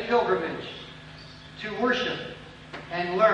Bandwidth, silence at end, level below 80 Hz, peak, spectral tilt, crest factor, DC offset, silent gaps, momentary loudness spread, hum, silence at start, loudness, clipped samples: 9.4 kHz; 0 s; -58 dBFS; -8 dBFS; -5.5 dB/octave; 20 dB; under 0.1%; none; 20 LU; none; 0 s; -28 LUFS; under 0.1%